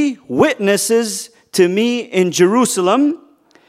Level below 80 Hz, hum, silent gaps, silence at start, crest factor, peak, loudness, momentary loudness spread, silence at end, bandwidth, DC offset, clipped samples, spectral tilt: -60 dBFS; none; none; 0 s; 16 dB; 0 dBFS; -15 LUFS; 9 LU; 0.55 s; 16 kHz; under 0.1%; under 0.1%; -4 dB/octave